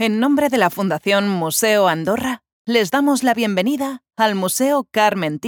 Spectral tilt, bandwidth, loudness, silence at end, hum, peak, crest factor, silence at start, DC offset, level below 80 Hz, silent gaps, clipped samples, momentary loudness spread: -4 dB/octave; over 20 kHz; -18 LUFS; 0 s; none; -2 dBFS; 16 dB; 0 s; under 0.1%; -64 dBFS; 2.52-2.65 s; under 0.1%; 5 LU